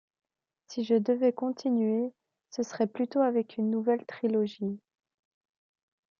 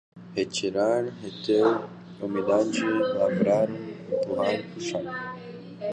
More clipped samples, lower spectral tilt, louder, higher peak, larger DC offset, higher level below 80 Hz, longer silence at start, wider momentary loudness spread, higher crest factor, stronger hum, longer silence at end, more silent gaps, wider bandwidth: neither; about the same, -6.5 dB/octave vs -5.5 dB/octave; second, -29 LUFS vs -26 LUFS; second, -14 dBFS vs -10 dBFS; neither; second, -82 dBFS vs -66 dBFS; first, 0.7 s vs 0.15 s; second, 10 LU vs 13 LU; about the same, 16 dB vs 16 dB; neither; first, 1.45 s vs 0 s; neither; second, 7.2 kHz vs 9.8 kHz